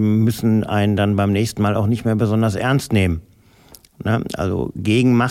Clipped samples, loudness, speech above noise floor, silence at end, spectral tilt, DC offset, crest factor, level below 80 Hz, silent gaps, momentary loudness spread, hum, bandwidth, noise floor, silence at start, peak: under 0.1%; -18 LUFS; 30 dB; 0 s; -7 dB/octave; under 0.1%; 12 dB; -42 dBFS; none; 5 LU; none; 16 kHz; -48 dBFS; 0 s; -6 dBFS